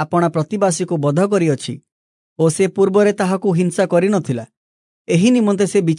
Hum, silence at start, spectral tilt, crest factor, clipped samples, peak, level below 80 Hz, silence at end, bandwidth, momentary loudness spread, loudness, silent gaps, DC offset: none; 0 s; -6 dB/octave; 14 dB; under 0.1%; -2 dBFS; -66 dBFS; 0 s; 11 kHz; 7 LU; -16 LUFS; 1.92-2.36 s, 4.57-5.05 s; under 0.1%